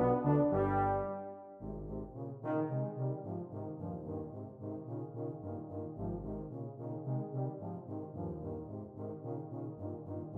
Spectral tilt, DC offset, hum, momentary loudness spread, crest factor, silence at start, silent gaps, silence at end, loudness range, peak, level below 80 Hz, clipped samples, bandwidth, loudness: -12 dB/octave; under 0.1%; none; 13 LU; 18 dB; 0 s; none; 0 s; 7 LU; -20 dBFS; -58 dBFS; under 0.1%; 3.5 kHz; -39 LUFS